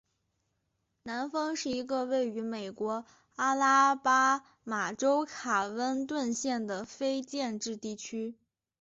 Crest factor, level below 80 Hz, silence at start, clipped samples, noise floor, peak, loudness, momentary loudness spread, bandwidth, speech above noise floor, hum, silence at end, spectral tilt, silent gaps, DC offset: 18 dB; -74 dBFS; 1.05 s; under 0.1%; -80 dBFS; -14 dBFS; -31 LUFS; 13 LU; 8 kHz; 49 dB; none; 0.5 s; -2 dB/octave; none; under 0.1%